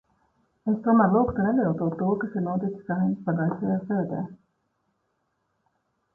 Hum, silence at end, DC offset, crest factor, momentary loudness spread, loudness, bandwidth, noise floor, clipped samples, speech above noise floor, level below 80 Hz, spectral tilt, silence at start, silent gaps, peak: none; 1.8 s; under 0.1%; 18 dB; 9 LU; -25 LUFS; 1.8 kHz; -75 dBFS; under 0.1%; 51 dB; -56 dBFS; -12.5 dB/octave; 0.65 s; none; -8 dBFS